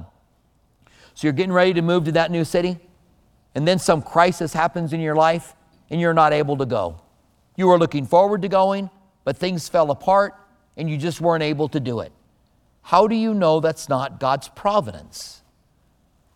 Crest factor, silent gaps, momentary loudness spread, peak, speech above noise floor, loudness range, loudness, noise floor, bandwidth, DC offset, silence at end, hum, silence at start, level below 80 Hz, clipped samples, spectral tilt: 20 dB; none; 13 LU; 0 dBFS; 42 dB; 3 LU; -20 LUFS; -61 dBFS; 16 kHz; under 0.1%; 1.05 s; none; 0 s; -54 dBFS; under 0.1%; -6 dB/octave